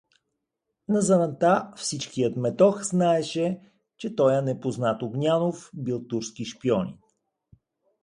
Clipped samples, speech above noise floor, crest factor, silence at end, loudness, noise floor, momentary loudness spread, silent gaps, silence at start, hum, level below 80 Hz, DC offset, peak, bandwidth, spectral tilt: under 0.1%; 57 dB; 20 dB; 1.05 s; -25 LUFS; -82 dBFS; 12 LU; none; 0.9 s; none; -66 dBFS; under 0.1%; -6 dBFS; 11.5 kHz; -5.5 dB/octave